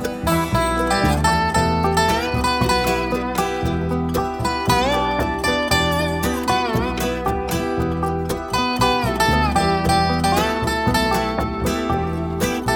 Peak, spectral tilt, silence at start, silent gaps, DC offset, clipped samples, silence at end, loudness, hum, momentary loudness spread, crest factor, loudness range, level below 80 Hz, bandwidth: -2 dBFS; -5 dB/octave; 0 s; none; under 0.1%; under 0.1%; 0 s; -19 LUFS; none; 5 LU; 16 dB; 2 LU; -32 dBFS; 19 kHz